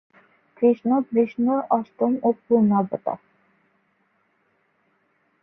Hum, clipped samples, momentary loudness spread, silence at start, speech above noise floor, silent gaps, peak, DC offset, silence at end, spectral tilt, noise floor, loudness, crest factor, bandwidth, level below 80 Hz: none; under 0.1%; 9 LU; 0.6 s; 46 dB; none; -6 dBFS; under 0.1%; 2.25 s; -11.5 dB/octave; -67 dBFS; -22 LUFS; 18 dB; 3.7 kHz; -70 dBFS